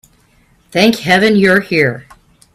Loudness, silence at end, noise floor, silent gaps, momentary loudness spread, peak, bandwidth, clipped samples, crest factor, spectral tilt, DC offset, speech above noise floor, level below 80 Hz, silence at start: -11 LUFS; 0.55 s; -52 dBFS; none; 9 LU; 0 dBFS; 14.5 kHz; under 0.1%; 14 dB; -5 dB/octave; under 0.1%; 41 dB; -50 dBFS; 0.75 s